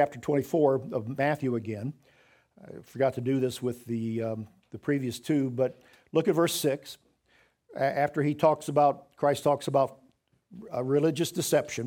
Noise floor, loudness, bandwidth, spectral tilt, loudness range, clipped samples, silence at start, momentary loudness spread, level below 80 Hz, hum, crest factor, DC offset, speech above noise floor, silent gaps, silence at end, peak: -66 dBFS; -28 LUFS; 18.5 kHz; -5.5 dB/octave; 4 LU; under 0.1%; 0 s; 12 LU; -70 dBFS; none; 20 dB; under 0.1%; 39 dB; none; 0 s; -10 dBFS